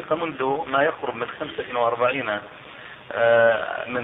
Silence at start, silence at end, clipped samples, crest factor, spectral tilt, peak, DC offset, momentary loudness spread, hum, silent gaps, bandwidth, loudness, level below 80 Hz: 0 s; 0 s; under 0.1%; 18 dB; -8 dB/octave; -6 dBFS; under 0.1%; 17 LU; none; none; 4 kHz; -23 LUFS; -62 dBFS